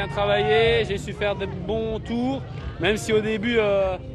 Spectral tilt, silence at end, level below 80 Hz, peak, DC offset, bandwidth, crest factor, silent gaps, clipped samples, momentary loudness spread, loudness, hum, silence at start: -5.5 dB/octave; 0 s; -40 dBFS; -8 dBFS; under 0.1%; 13 kHz; 16 dB; none; under 0.1%; 9 LU; -23 LUFS; none; 0 s